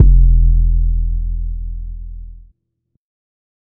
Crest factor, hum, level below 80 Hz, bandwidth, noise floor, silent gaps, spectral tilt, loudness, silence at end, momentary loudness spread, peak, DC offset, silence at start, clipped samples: 14 dB; none; -14 dBFS; 0.4 kHz; -69 dBFS; none; -17 dB/octave; -17 LUFS; 0.6 s; 21 LU; 0 dBFS; under 0.1%; 0 s; under 0.1%